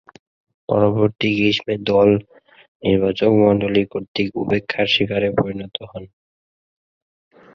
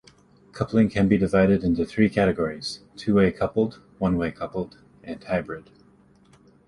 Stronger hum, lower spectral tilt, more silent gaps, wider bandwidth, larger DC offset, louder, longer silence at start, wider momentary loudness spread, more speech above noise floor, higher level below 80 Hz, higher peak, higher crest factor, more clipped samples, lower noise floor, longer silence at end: neither; about the same, -7 dB/octave vs -7.5 dB/octave; first, 2.68-2.80 s, 4.08-4.15 s vs none; second, 7 kHz vs 11.5 kHz; neither; first, -18 LUFS vs -23 LUFS; first, 0.7 s vs 0.55 s; about the same, 12 LU vs 13 LU; first, over 72 dB vs 33 dB; about the same, -48 dBFS vs -46 dBFS; first, -2 dBFS vs -6 dBFS; about the same, 18 dB vs 18 dB; neither; first, under -90 dBFS vs -56 dBFS; first, 1.5 s vs 1.05 s